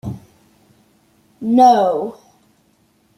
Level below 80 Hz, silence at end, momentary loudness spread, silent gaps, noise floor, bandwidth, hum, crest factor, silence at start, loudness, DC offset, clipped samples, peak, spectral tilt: -58 dBFS; 1.05 s; 20 LU; none; -58 dBFS; 12 kHz; none; 18 dB; 0.05 s; -14 LUFS; under 0.1%; under 0.1%; -2 dBFS; -6.5 dB/octave